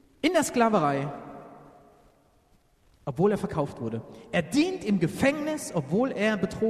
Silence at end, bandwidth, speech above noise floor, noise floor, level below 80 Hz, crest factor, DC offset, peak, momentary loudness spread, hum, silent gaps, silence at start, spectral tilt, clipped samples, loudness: 0 s; 13.5 kHz; 37 dB; -63 dBFS; -58 dBFS; 18 dB; under 0.1%; -10 dBFS; 14 LU; none; none; 0.25 s; -5.5 dB/octave; under 0.1%; -27 LUFS